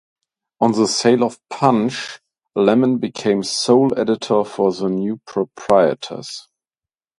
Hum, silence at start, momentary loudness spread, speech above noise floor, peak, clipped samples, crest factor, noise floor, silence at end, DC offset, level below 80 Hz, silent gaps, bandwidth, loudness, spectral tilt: none; 0.6 s; 13 LU; over 73 dB; 0 dBFS; under 0.1%; 18 dB; under -90 dBFS; 0.8 s; under 0.1%; -60 dBFS; none; 11.5 kHz; -18 LUFS; -5 dB/octave